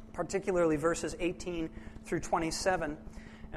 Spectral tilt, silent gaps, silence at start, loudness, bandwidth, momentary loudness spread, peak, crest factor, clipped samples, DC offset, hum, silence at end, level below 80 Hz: -4.5 dB/octave; none; 0 s; -33 LUFS; 13 kHz; 16 LU; -18 dBFS; 16 dB; under 0.1%; under 0.1%; none; 0 s; -50 dBFS